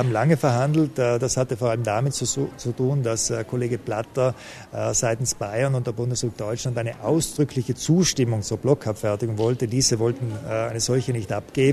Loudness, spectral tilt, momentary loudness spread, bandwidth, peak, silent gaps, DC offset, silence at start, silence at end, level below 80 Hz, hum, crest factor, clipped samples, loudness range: -23 LUFS; -5 dB/octave; 7 LU; 13.5 kHz; -4 dBFS; none; under 0.1%; 0 s; 0 s; -50 dBFS; none; 18 dB; under 0.1%; 3 LU